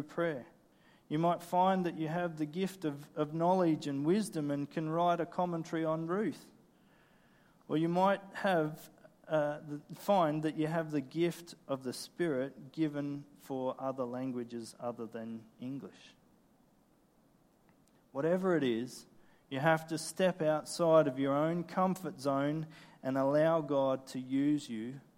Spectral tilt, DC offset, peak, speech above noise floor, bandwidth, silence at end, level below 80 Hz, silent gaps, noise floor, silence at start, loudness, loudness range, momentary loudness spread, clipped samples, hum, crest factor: -6.5 dB/octave; under 0.1%; -14 dBFS; 35 dB; 16.5 kHz; 0.15 s; -78 dBFS; none; -68 dBFS; 0 s; -34 LUFS; 9 LU; 13 LU; under 0.1%; none; 20 dB